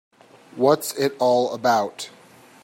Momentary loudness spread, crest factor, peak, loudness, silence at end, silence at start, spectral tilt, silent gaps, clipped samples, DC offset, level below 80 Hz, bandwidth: 16 LU; 18 dB; -4 dBFS; -21 LUFS; 0.55 s; 0.55 s; -4.5 dB/octave; none; under 0.1%; under 0.1%; -70 dBFS; 16.5 kHz